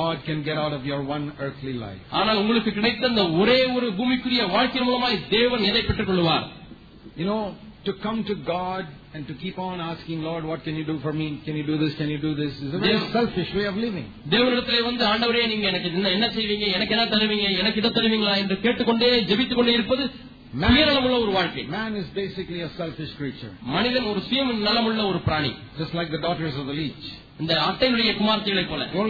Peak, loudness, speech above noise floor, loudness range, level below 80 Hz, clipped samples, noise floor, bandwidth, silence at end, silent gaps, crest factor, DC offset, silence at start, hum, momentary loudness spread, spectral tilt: -6 dBFS; -23 LUFS; 21 dB; 8 LU; -46 dBFS; under 0.1%; -45 dBFS; 5 kHz; 0 s; none; 18 dB; under 0.1%; 0 s; none; 12 LU; -7 dB/octave